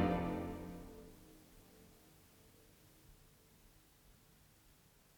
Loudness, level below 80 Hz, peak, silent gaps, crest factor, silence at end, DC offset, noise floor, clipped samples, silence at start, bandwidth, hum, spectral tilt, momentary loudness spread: -44 LUFS; -62 dBFS; -22 dBFS; none; 24 dB; 1.05 s; under 0.1%; -68 dBFS; under 0.1%; 0 s; over 20 kHz; none; -7 dB/octave; 23 LU